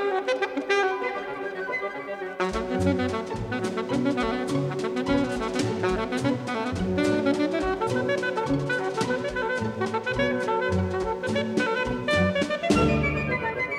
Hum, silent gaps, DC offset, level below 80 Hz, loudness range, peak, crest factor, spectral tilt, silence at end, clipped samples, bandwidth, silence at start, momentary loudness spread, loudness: none; none; under 0.1%; -46 dBFS; 3 LU; -8 dBFS; 18 dB; -6 dB/octave; 0 s; under 0.1%; 13 kHz; 0 s; 6 LU; -26 LUFS